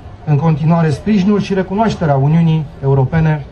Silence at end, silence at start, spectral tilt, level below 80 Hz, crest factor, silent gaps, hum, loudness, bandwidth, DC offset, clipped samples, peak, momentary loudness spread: 0 s; 0 s; -8.5 dB/octave; -36 dBFS; 12 dB; none; none; -14 LUFS; 8.4 kHz; under 0.1%; under 0.1%; -2 dBFS; 4 LU